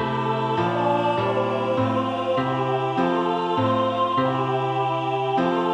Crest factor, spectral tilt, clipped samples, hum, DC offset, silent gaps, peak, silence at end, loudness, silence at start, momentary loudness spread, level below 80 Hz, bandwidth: 12 dB; -7.5 dB/octave; under 0.1%; none; under 0.1%; none; -10 dBFS; 0 s; -23 LUFS; 0 s; 2 LU; -60 dBFS; 10 kHz